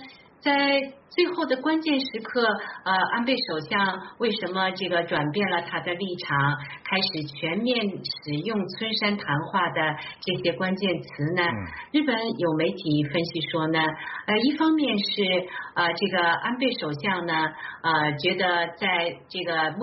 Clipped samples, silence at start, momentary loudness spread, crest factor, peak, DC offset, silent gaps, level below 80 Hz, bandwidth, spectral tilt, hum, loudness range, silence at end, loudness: under 0.1%; 0 s; 7 LU; 16 dB; -8 dBFS; under 0.1%; none; -64 dBFS; 6 kHz; -2.5 dB/octave; none; 2 LU; 0 s; -25 LUFS